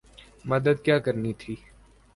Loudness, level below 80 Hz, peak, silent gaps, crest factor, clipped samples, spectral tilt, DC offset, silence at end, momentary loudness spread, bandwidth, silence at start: -25 LUFS; -56 dBFS; -6 dBFS; none; 20 dB; under 0.1%; -7.5 dB/octave; under 0.1%; 0.6 s; 17 LU; 11.5 kHz; 0.45 s